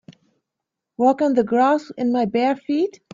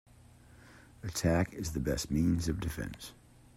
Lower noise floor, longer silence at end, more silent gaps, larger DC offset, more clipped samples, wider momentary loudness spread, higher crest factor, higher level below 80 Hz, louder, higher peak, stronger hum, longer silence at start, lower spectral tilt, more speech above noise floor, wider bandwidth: first, -83 dBFS vs -58 dBFS; second, 0.25 s vs 0.45 s; neither; neither; neither; second, 5 LU vs 14 LU; about the same, 14 dB vs 16 dB; second, -66 dBFS vs -48 dBFS; first, -20 LUFS vs -33 LUFS; first, -6 dBFS vs -18 dBFS; neither; first, 1 s vs 0.5 s; about the same, -6.5 dB/octave vs -5.5 dB/octave; first, 64 dB vs 25 dB; second, 7.6 kHz vs 16 kHz